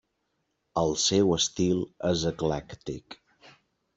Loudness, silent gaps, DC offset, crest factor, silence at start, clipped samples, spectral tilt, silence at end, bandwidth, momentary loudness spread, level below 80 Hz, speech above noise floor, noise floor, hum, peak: -26 LUFS; none; under 0.1%; 18 dB; 0.75 s; under 0.1%; -4 dB/octave; 0.85 s; 8.2 kHz; 16 LU; -54 dBFS; 50 dB; -77 dBFS; none; -12 dBFS